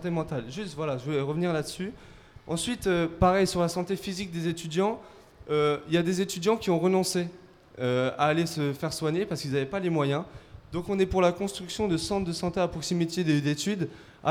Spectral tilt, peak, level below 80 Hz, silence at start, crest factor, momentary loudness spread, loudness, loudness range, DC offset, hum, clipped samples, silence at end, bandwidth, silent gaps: -5.5 dB/octave; -10 dBFS; -50 dBFS; 0 s; 18 dB; 9 LU; -28 LUFS; 2 LU; under 0.1%; none; under 0.1%; 0 s; 16.5 kHz; none